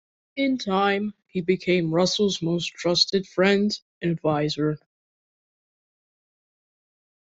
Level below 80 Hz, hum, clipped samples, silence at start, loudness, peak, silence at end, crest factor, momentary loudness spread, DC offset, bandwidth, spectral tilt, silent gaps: -62 dBFS; none; under 0.1%; 0.35 s; -23 LUFS; -4 dBFS; 2.55 s; 20 dB; 8 LU; under 0.1%; 8 kHz; -5 dB/octave; 3.82-4.01 s